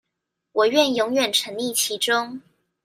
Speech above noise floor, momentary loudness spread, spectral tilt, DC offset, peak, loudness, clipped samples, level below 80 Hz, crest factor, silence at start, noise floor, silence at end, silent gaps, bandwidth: 59 dB; 10 LU; -1.5 dB/octave; under 0.1%; -4 dBFS; -21 LUFS; under 0.1%; -70 dBFS; 20 dB; 0.55 s; -81 dBFS; 0.45 s; none; 16 kHz